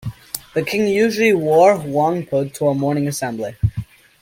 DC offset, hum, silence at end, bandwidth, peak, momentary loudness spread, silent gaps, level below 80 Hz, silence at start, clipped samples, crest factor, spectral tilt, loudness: under 0.1%; none; 0.4 s; 17 kHz; 0 dBFS; 11 LU; none; -44 dBFS; 0 s; under 0.1%; 18 dB; -6 dB/octave; -18 LUFS